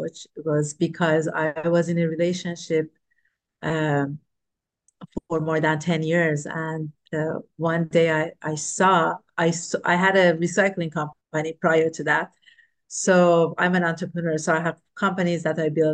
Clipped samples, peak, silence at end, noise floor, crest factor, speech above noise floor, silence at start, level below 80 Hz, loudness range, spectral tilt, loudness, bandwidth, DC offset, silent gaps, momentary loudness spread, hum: under 0.1%; -6 dBFS; 0 s; -83 dBFS; 18 dB; 61 dB; 0 s; -64 dBFS; 6 LU; -5.5 dB/octave; -23 LUFS; 10 kHz; under 0.1%; none; 11 LU; none